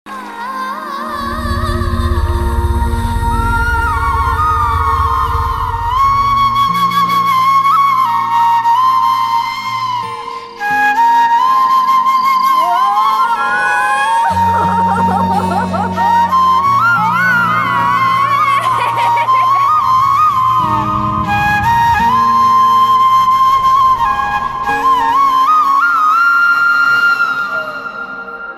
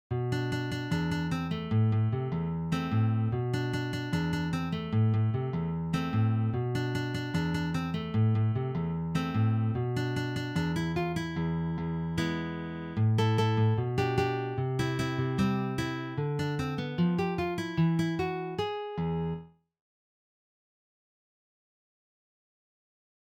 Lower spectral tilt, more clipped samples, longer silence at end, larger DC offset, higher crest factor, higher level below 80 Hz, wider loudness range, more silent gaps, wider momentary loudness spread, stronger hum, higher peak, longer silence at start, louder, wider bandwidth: second, -5 dB/octave vs -7.5 dB/octave; neither; second, 0 s vs 3.85 s; neither; second, 8 dB vs 14 dB; first, -26 dBFS vs -54 dBFS; about the same, 4 LU vs 4 LU; neither; about the same, 8 LU vs 6 LU; neither; first, -4 dBFS vs -16 dBFS; about the same, 0.05 s vs 0.1 s; first, -12 LUFS vs -30 LUFS; first, 15.5 kHz vs 12.5 kHz